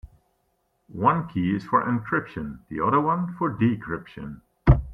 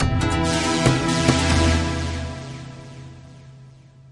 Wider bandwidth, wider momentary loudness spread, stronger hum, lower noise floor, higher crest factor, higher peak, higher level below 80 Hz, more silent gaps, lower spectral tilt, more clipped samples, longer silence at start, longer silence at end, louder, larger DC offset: second, 5.6 kHz vs 11.5 kHz; second, 14 LU vs 21 LU; neither; first, -71 dBFS vs -46 dBFS; about the same, 22 dB vs 22 dB; about the same, -2 dBFS vs 0 dBFS; about the same, -36 dBFS vs -34 dBFS; neither; first, -10 dB/octave vs -5 dB/octave; neither; about the same, 0.05 s vs 0 s; second, 0 s vs 0.4 s; second, -25 LUFS vs -20 LUFS; neither